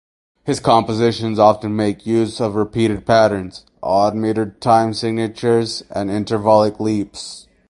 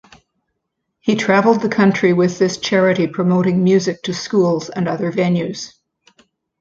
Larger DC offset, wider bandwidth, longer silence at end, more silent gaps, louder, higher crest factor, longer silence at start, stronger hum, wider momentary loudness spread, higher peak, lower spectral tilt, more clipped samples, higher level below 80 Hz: neither; first, 11.5 kHz vs 7.6 kHz; second, 0.3 s vs 0.95 s; neither; about the same, -17 LUFS vs -16 LUFS; about the same, 18 dB vs 16 dB; second, 0.45 s vs 1.05 s; neither; about the same, 10 LU vs 8 LU; about the same, 0 dBFS vs -2 dBFS; about the same, -6 dB/octave vs -6 dB/octave; neither; first, -48 dBFS vs -58 dBFS